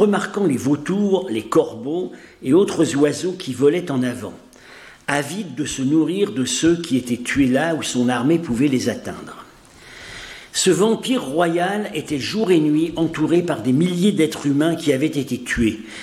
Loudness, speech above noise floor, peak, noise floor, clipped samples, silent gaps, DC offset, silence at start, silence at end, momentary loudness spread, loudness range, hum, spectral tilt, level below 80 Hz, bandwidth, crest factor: -19 LUFS; 25 dB; -4 dBFS; -44 dBFS; under 0.1%; none; under 0.1%; 0 s; 0 s; 10 LU; 3 LU; none; -5 dB/octave; -48 dBFS; 14.5 kHz; 16 dB